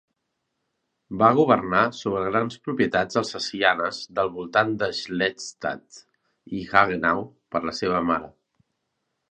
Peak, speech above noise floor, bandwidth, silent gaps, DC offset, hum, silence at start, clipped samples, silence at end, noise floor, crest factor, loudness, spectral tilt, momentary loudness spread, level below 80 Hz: -2 dBFS; 55 dB; 9.4 kHz; none; under 0.1%; none; 1.1 s; under 0.1%; 1.05 s; -78 dBFS; 24 dB; -23 LUFS; -5 dB/octave; 11 LU; -58 dBFS